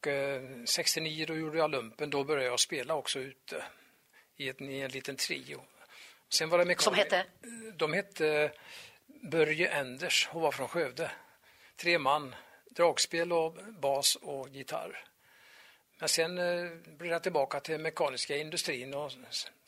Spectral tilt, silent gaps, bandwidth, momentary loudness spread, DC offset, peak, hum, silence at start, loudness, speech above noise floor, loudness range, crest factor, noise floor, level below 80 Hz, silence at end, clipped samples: -2 dB/octave; none; 16 kHz; 15 LU; under 0.1%; -12 dBFS; none; 0.05 s; -32 LUFS; 32 dB; 4 LU; 22 dB; -65 dBFS; -78 dBFS; 0.2 s; under 0.1%